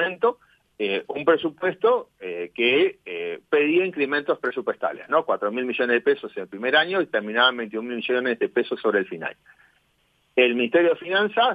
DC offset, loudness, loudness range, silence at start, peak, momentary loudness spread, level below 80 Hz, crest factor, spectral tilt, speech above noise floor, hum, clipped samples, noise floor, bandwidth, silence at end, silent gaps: under 0.1%; -23 LUFS; 2 LU; 0 s; -6 dBFS; 10 LU; -74 dBFS; 18 dB; -6.5 dB/octave; 43 dB; none; under 0.1%; -66 dBFS; 5 kHz; 0 s; none